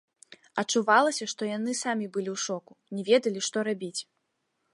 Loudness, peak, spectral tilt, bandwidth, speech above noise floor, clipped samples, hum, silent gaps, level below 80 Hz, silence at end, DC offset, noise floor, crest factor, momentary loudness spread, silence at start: -28 LUFS; -8 dBFS; -3 dB/octave; 11.5 kHz; 50 dB; under 0.1%; none; none; -82 dBFS; 0.7 s; under 0.1%; -78 dBFS; 22 dB; 14 LU; 0.55 s